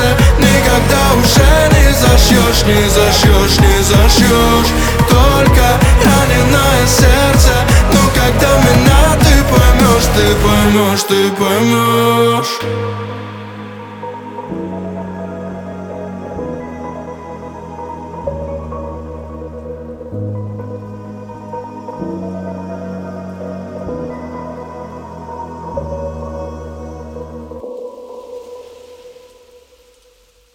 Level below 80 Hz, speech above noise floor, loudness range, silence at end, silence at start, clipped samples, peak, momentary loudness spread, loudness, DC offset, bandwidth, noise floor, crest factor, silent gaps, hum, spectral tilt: -18 dBFS; 41 dB; 17 LU; 1.45 s; 0 s; under 0.1%; 0 dBFS; 20 LU; -10 LUFS; under 0.1%; over 20 kHz; -50 dBFS; 12 dB; none; none; -4.5 dB/octave